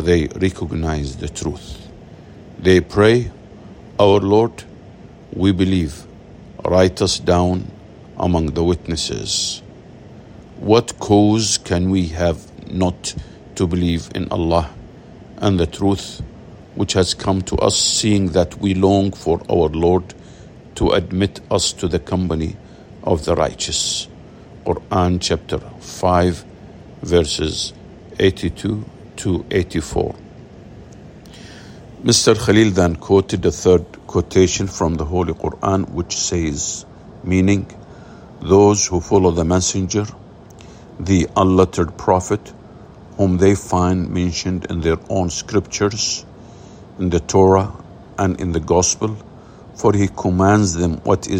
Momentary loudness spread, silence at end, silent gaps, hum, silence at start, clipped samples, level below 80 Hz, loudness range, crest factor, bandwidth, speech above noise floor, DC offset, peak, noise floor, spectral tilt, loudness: 15 LU; 0 s; none; none; 0 s; under 0.1%; -40 dBFS; 4 LU; 18 dB; 16 kHz; 23 dB; under 0.1%; 0 dBFS; -40 dBFS; -5 dB/octave; -18 LUFS